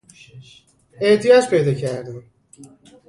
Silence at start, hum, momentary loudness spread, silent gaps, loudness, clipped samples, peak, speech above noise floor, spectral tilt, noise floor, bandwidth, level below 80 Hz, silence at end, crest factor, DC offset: 0.35 s; none; 21 LU; none; -17 LUFS; under 0.1%; -2 dBFS; 28 dB; -5.5 dB/octave; -46 dBFS; 11.5 kHz; -60 dBFS; 0.45 s; 18 dB; under 0.1%